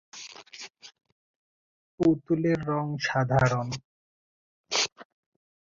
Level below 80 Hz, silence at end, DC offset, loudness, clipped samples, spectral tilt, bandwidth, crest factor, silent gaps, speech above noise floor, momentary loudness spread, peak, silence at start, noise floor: -56 dBFS; 0.75 s; under 0.1%; -27 LUFS; under 0.1%; -5 dB/octave; 7.8 kHz; 22 dB; 1.12-1.98 s, 3.84-4.64 s, 4.92-4.96 s; over 63 dB; 19 LU; -8 dBFS; 0.15 s; under -90 dBFS